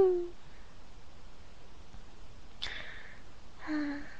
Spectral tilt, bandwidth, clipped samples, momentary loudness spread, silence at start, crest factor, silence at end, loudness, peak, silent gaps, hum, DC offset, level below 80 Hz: -5.5 dB/octave; 8.8 kHz; under 0.1%; 20 LU; 0 s; 20 dB; 0 s; -37 LUFS; -18 dBFS; none; none; 0.9%; -54 dBFS